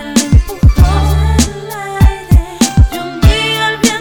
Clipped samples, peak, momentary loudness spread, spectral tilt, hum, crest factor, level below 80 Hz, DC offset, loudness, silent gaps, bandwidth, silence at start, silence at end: 2%; 0 dBFS; 4 LU; -5 dB/octave; none; 10 dB; -14 dBFS; under 0.1%; -11 LUFS; none; 18 kHz; 0 s; 0 s